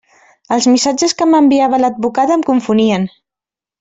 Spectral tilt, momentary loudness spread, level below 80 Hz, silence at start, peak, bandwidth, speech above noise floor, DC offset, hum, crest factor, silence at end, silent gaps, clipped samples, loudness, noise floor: -4.5 dB/octave; 6 LU; -56 dBFS; 0.5 s; -2 dBFS; 8 kHz; 76 dB; under 0.1%; none; 12 dB; 0.75 s; none; under 0.1%; -13 LUFS; -88 dBFS